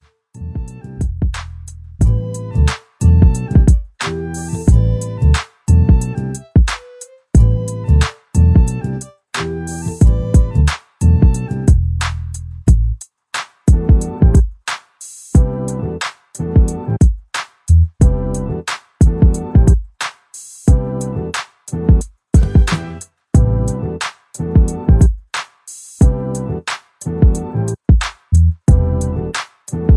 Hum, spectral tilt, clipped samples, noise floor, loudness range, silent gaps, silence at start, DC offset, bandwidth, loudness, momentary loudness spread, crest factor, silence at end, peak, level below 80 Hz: none; -6.5 dB/octave; under 0.1%; -39 dBFS; 2 LU; none; 0.35 s; under 0.1%; 11 kHz; -16 LUFS; 14 LU; 14 dB; 0 s; 0 dBFS; -18 dBFS